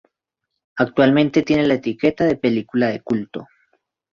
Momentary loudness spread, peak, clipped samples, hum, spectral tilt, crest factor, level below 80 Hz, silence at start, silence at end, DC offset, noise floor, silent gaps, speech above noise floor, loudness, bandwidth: 10 LU; -2 dBFS; under 0.1%; none; -7 dB/octave; 18 dB; -54 dBFS; 0.75 s; 0.7 s; under 0.1%; -80 dBFS; none; 62 dB; -18 LUFS; 7.2 kHz